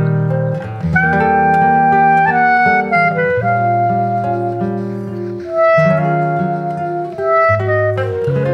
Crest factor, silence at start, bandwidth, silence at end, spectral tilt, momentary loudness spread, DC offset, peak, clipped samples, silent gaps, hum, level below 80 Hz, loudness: 12 dB; 0 s; 6.4 kHz; 0 s; -9 dB/octave; 9 LU; under 0.1%; -2 dBFS; under 0.1%; none; none; -44 dBFS; -14 LUFS